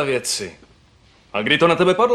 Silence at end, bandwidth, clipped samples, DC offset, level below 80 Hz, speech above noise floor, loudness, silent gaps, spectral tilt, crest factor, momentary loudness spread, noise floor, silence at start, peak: 0 s; 13.5 kHz; under 0.1%; under 0.1%; -54 dBFS; 35 dB; -18 LUFS; none; -3.5 dB/octave; 18 dB; 13 LU; -53 dBFS; 0 s; 0 dBFS